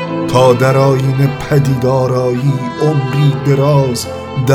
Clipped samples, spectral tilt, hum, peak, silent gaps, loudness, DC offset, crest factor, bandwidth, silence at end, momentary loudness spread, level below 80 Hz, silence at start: under 0.1%; -7 dB/octave; none; 0 dBFS; none; -13 LUFS; under 0.1%; 12 dB; 15 kHz; 0 s; 6 LU; -42 dBFS; 0 s